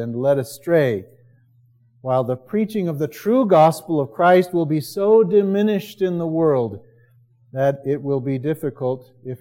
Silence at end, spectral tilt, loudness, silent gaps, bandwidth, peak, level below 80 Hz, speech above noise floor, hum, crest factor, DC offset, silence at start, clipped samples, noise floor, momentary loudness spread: 0.05 s; -7.5 dB/octave; -19 LUFS; none; 16.5 kHz; -4 dBFS; -68 dBFS; 37 dB; none; 16 dB; under 0.1%; 0 s; under 0.1%; -56 dBFS; 11 LU